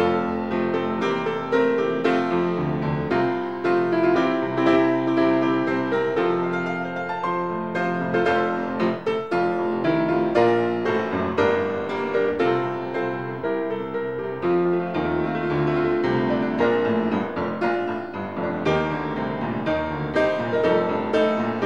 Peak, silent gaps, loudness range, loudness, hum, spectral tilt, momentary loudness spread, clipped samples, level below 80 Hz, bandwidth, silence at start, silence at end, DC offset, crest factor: -6 dBFS; none; 3 LU; -23 LUFS; none; -7.5 dB/octave; 7 LU; under 0.1%; -54 dBFS; 7.6 kHz; 0 s; 0 s; 0.4%; 16 dB